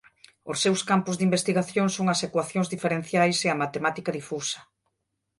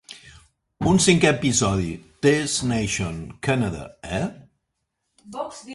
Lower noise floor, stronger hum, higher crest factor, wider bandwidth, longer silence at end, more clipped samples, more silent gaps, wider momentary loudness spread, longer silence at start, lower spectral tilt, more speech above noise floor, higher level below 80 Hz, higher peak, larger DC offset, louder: about the same, -80 dBFS vs -77 dBFS; neither; about the same, 18 dB vs 20 dB; about the same, 11.5 kHz vs 11.5 kHz; first, 0.75 s vs 0 s; neither; neither; second, 9 LU vs 17 LU; first, 0.45 s vs 0.1 s; about the same, -4.5 dB/octave vs -4.5 dB/octave; about the same, 55 dB vs 55 dB; second, -68 dBFS vs -46 dBFS; second, -8 dBFS vs -2 dBFS; neither; second, -25 LUFS vs -22 LUFS